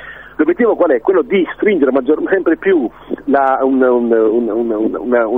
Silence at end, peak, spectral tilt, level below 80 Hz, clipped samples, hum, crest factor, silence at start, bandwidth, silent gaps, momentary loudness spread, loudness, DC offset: 0 s; 0 dBFS; -9 dB/octave; -50 dBFS; under 0.1%; none; 12 dB; 0 s; 3.8 kHz; none; 5 LU; -14 LUFS; 0.3%